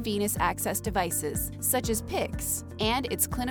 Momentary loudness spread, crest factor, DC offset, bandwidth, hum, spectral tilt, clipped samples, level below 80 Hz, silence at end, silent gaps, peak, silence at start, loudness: 4 LU; 16 dB; under 0.1%; over 20 kHz; none; -3.5 dB/octave; under 0.1%; -42 dBFS; 0 s; none; -12 dBFS; 0 s; -28 LUFS